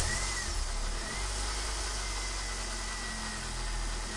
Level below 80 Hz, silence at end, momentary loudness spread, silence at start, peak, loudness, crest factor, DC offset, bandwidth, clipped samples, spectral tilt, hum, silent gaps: -38 dBFS; 0 s; 4 LU; 0 s; -16 dBFS; -35 LUFS; 18 dB; under 0.1%; 11.5 kHz; under 0.1%; -2 dB/octave; none; none